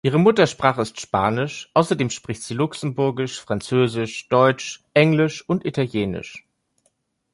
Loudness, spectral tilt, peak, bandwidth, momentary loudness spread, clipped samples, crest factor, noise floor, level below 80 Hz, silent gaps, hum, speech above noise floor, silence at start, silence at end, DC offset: -21 LUFS; -5.5 dB/octave; -2 dBFS; 11.5 kHz; 11 LU; under 0.1%; 18 dB; -68 dBFS; -54 dBFS; none; none; 48 dB; 0.05 s; 0.95 s; under 0.1%